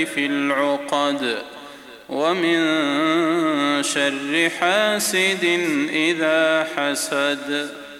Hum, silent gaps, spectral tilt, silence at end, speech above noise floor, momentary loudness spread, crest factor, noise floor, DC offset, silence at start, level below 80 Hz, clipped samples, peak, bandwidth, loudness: none; none; -3 dB/octave; 0 s; 20 dB; 7 LU; 16 dB; -40 dBFS; under 0.1%; 0 s; -68 dBFS; under 0.1%; -4 dBFS; 16 kHz; -20 LUFS